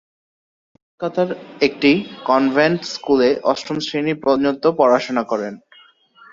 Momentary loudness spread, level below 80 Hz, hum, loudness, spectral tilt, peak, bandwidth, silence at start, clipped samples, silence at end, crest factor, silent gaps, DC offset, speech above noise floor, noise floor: 8 LU; -60 dBFS; none; -18 LUFS; -5.5 dB/octave; -2 dBFS; 7.6 kHz; 1 s; under 0.1%; 0.75 s; 18 dB; none; under 0.1%; 33 dB; -50 dBFS